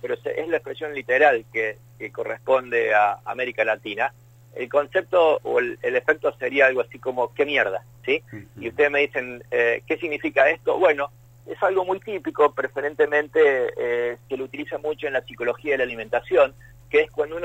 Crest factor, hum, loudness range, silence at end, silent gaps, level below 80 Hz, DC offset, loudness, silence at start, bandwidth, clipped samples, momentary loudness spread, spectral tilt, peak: 18 dB; none; 2 LU; 0 s; none; -60 dBFS; under 0.1%; -22 LUFS; 0.05 s; 15.5 kHz; under 0.1%; 11 LU; -5.5 dB/octave; -4 dBFS